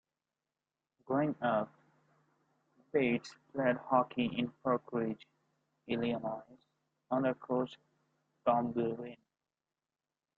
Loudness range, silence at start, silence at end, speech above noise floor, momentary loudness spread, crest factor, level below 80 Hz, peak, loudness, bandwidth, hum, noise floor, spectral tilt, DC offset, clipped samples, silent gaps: 3 LU; 1.1 s; 1.2 s; over 56 dB; 10 LU; 22 dB; -74 dBFS; -16 dBFS; -35 LUFS; 7.6 kHz; none; under -90 dBFS; -7.5 dB/octave; under 0.1%; under 0.1%; none